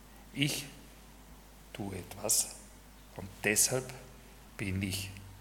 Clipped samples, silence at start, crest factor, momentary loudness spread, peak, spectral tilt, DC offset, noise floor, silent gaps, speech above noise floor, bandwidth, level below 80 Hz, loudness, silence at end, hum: under 0.1%; 0 s; 26 dB; 24 LU; -12 dBFS; -2.5 dB/octave; under 0.1%; -54 dBFS; none; 20 dB; 18 kHz; -58 dBFS; -32 LUFS; 0 s; none